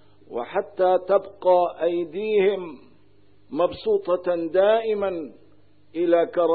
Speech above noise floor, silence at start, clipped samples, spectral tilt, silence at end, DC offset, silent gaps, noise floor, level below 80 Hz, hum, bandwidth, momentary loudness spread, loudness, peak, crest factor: 37 dB; 0.3 s; under 0.1%; -10 dB/octave; 0 s; 0.3%; none; -59 dBFS; -64 dBFS; none; 4.7 kHz; 14 LU; -23 LUFS; -6 dBFS; 16 dB